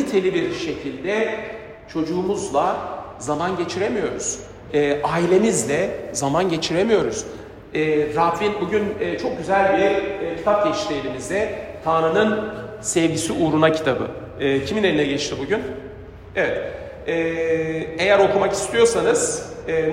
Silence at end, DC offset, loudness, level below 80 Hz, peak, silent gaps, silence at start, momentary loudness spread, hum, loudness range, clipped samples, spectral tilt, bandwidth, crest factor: 0 s; under 0.1%; -21 LUFS; -48 dBFS; -2 dBFS; none; 0 s; 11 LU; none; 4 LU; under 0.1%; -4.5 dB/octave; 15.5 kHz; 18 dB